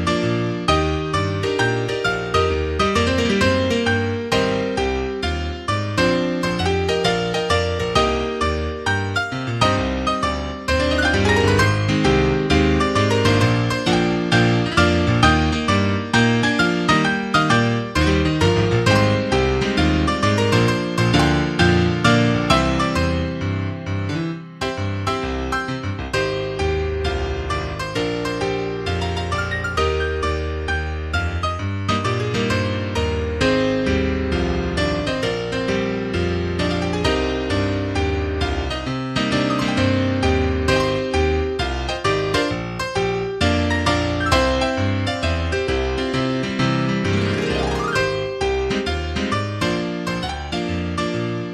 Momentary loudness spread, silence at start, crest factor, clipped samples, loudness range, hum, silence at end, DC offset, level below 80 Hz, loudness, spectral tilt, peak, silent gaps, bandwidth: 7 LU; 0 s; 18 dB; under 0.1%; 6 LU; none; 0 s; under 0.1%; -32 dBFS; -20 LUFS; -5.5 dB/octave; -2 dBFS; none; 13 kHz